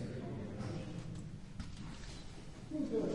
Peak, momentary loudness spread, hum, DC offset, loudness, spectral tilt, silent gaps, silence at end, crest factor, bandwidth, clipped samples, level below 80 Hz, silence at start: -26 dBFS; 11 LU; none; under 0.1%; -45 LUFS; -7 dB/octave; none; 0 s; 16 dB; 11.5 kHz; under 0.1%; -54 dBFS; 0 s